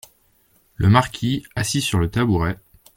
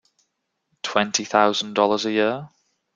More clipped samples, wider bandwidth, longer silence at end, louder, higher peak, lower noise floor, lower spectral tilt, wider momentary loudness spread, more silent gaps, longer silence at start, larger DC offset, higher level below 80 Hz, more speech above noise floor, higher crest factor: neither; first, 16.5 kHz vs 9.4 kHz; about the same, 0.4 s vs 0.5 s; about the same, -20 LUFS vs -21 LUFS; about the same, 0 dBFS vs -2 dBFS; second, -60 dBFS vs -75 dBFS; first, -5.5 dB/octave vs -3 dB/octave; about the same, 8 LU vs 7 LU; neither; about the same, 0.8 s vs 0.85 s; neither; first, -40 dBFS vs -68 dBFS; second, 41 dB vs 54 dB; about the same, 20 dB vs 22 dB